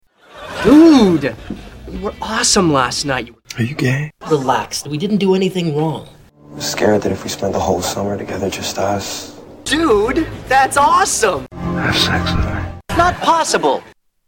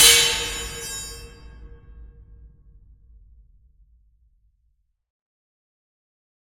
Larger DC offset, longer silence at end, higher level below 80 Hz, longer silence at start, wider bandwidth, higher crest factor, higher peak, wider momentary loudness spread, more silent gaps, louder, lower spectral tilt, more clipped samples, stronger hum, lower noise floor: neither; second, 0.4 s vs 4.1 s; first, -36 dBFS vs -46 dBFS; first, 0.35 s vs 0 s; about the same, 17 kHz vs 16.5 kHz; second, 16 dB vs 26 dB; about the same, 0 dBFS vs 0 dBFS; second, 14 LU vs 26 LU; neither; first, -15 LUFS vs -19 LUFS; first, -4.5 dB/octave vs 1 dB/octave; neither; neither; second, -36 dBFS vs -68 dBFS